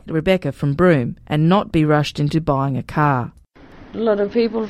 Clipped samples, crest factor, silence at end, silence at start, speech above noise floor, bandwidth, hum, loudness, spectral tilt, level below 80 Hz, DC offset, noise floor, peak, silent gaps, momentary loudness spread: under 0.1%; 18 dB; 0 s; 0.05 s; 25 dB; 12 kHz; none; -18 LUFS; -7.5 dB/octave; -42 dBFS; under 0.1%; -43 dBFS; -2 dBFS; none; 7 LU